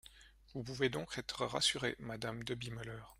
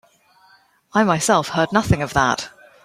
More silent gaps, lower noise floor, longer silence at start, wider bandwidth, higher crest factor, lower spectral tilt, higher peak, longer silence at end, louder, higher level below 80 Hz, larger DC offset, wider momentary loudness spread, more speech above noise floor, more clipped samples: neither; first, -61 dBFS vs -55 dBFS; second, 0.05 s vs 0.95 s; about the same, 16 kHz vs 16 kHz; about the same, 20 dB vs 18 dB; about the same, -3.5 dB/octave vs -4.5 dB/octave; second, -20 dBFS vs -2 dBFS; second, 0.05 s vs 0.35 s; second, -39 LUFS vs -19 LUFS; second, -64 dBFS vs -42 dBFS; neither; first, 14 LU vs 7 LU; second, 21 dB vs 37 dB; neither